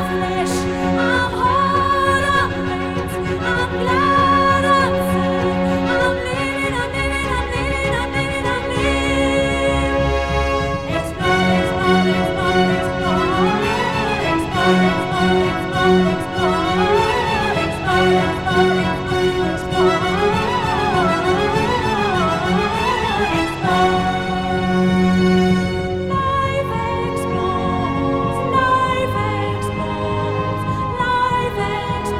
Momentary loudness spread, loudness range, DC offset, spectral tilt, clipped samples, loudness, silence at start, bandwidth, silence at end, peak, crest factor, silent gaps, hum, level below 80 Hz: 6 LU; 3 LU; under 0.1%; -5.5 dB/octave; under 0.1%; -18 LUFS; 0 s; 14.5 kHz; 0 s; -2 dBFS; 16 dB; none; none; -34 dBFS